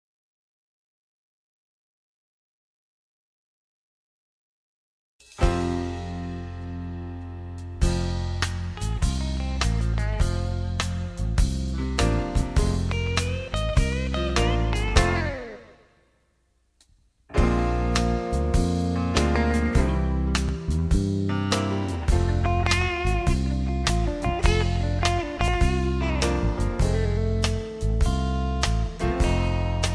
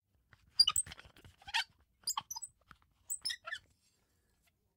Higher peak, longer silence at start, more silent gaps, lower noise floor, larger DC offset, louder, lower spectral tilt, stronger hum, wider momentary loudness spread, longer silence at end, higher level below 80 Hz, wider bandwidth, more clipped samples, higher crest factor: first, -2 dBFS vs -16 dBFS; first, 5.35 s vs 0.6 s; neither; second, -67 dBFS vs -76 dBFS; neither; first, -25 LUFS vs -35 LUFS; first, -5.5 dB/octave vs 2 dB/octave; neither; second, 7 LU vs 19 LU; second, 0 s vs 1.2 s; first, -28 dBFS vs -70 dBFS; second, 11 kHz vs 16 kHz; neither; about the same, 22 dB vs 26 dB